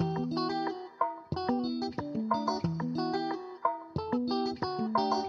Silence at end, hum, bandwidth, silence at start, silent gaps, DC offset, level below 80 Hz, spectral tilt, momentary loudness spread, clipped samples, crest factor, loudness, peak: 0 s; none; 7.2 kHz; 0 s; none; under 0.1%; -62 dBFS; -7 dB/octave; 5 LU; under 0.1%; 18 dB; -33 LUFS; -14 dBFS